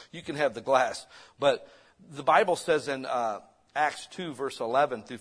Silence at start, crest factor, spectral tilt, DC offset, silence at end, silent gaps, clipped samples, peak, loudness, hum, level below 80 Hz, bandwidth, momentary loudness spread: 0 s; 22 dB; -4 dB/octave; under 0.1%; 0 s; none; under 0.1%; -8 dBFS; -28 LUFS; none; -70 dBFS; 11 kHz; 14 LU